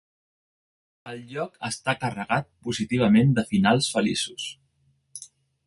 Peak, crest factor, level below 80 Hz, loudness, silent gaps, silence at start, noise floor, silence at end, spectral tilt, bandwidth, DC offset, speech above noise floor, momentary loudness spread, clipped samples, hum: -6 dBFS; 20 dB; -58 dBFS; -24 LUFS; none; 1.05 s; -67 dBFS; 0.4 s; -5 dB/octave; 11.5 kHz; under 0.1%; 43 dB; 21 LU; under 0.1%; none